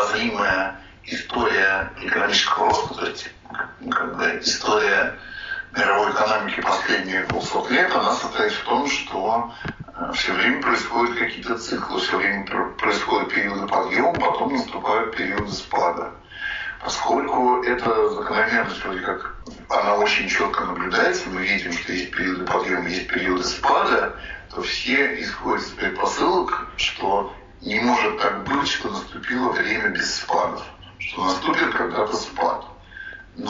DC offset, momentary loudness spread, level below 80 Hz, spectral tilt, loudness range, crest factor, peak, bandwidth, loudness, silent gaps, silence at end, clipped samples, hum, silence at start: under 0.1%; 12 LU; -48 dBFS; -1 dB/octave; 2 LU; 18 dB; -6 dBFS; 7.6 kHz; -22 LUFS; none; 0 s; under 0.1%; none; 0 s